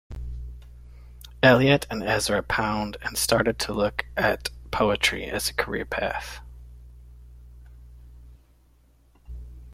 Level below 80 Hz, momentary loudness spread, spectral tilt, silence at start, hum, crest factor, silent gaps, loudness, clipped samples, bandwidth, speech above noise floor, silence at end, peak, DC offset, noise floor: -42 dBFS; 23 LU; -4 dB/octave; 0.1 s; none; 24 dB; none; -24 LUFS; under 0.1%; 16.5 kHz; 35 dB; 0 s; -2 dBFS; under 0.1%; -58 dBFS